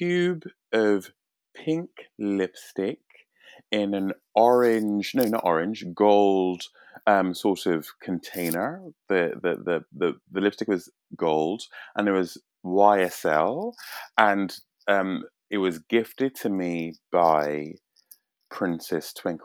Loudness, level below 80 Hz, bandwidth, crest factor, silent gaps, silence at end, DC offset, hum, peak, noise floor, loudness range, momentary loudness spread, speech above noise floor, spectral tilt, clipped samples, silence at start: -25 LUFS; -76 dBFS; 19.5 kHz; 24 dB; none; 0.05 s; under 0.1%; none; -2 dBFS; -57 dBFS; 5 LU; 13 LU; 33 dB; -5.5 dB/octave; under 0.1%; 0 s